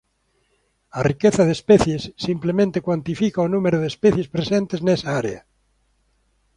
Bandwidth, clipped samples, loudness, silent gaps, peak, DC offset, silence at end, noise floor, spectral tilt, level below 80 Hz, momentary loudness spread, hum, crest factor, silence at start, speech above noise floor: 11 kHz; under 0.1%; -20 LUFS; none; -2 dBFS; under 0.1%; 1.15 s; -67 dBFS; -6.5 dB/octave; -48 dBFS; 9 LU; none; 18 dB; 0.95 s; 48 dB